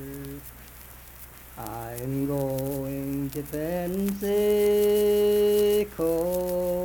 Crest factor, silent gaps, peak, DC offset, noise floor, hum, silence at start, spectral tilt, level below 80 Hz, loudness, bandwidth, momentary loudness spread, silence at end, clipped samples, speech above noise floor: 14 dB; none; -12 dBFS; under 0.1%; -46 dBFS; none; 0 s; -6 dB/octave; -48 dBFS; -25 LUFS; 19 kHz; 22 LU; 0 s; under 0.1%; 21 dB